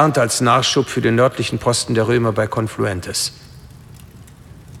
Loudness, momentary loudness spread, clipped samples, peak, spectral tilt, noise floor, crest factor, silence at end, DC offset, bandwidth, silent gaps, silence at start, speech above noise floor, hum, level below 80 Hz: -17 LUFS; 7 LU; under 0.1%; -2 dBFS; -4.5 dB/octave; -40 dBFS; 18 dB; 0 s; under 0.1%; 15.5 kHz; none; 0 s; 24 dB; none; -48 dBFS